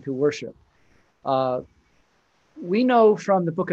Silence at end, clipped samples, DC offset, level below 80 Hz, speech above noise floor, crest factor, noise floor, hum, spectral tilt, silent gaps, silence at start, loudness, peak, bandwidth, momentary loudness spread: 0 s; under 0.1%; under 0.1%; -66 dBFS; 44 dB; 18 dB; -65 dBFS; none; -7 dB/octave; none; 0.05 s; -21 LUFS; -6 dBFS; 7.8 kHz; 18 LU